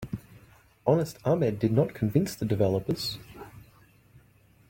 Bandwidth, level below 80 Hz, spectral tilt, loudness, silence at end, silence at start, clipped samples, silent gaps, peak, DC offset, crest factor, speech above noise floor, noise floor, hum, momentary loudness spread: 17 kHz; -56 dBFS; -7 dB/octave; -27 LUFS; 1.1 s; 0 s; under 0.1%; none; -10 dBFS; under 0.1%; 20 dB; 34 dB; -60 dBFS; none; 16 LU